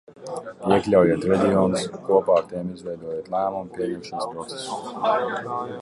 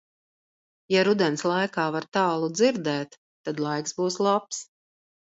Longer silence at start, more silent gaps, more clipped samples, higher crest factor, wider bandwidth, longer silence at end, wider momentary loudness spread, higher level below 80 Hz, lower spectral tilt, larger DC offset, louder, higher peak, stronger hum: second, 0.1 s vs 0.9 s; second, none vs 3.18-3.44 s; neither; about the same, 18 dB vs 18 dB; first, 11.5 kHz vs 8 kHz; second, 0 s vs 0.7 s; about the same, 14 LU vs 12 LU; first, -54 dBFS vs -74 dBFS; first, -6 dB/octave vs -4.5 dB/octave; neither; about the same, -23 LUFS vs -25 LUFS; first, -4 dBFS vs -8 dBFS; neither